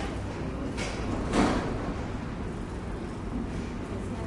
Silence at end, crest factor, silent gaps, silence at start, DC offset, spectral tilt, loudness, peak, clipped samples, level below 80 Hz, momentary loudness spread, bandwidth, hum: 0 s; 20 dB; none; 0 s; under 0.1%; -6 dB/octave; -32 LUFS; -12 dBFS; under 0.1%; -38 dBFS; 10 LU; 11.5 kHz; none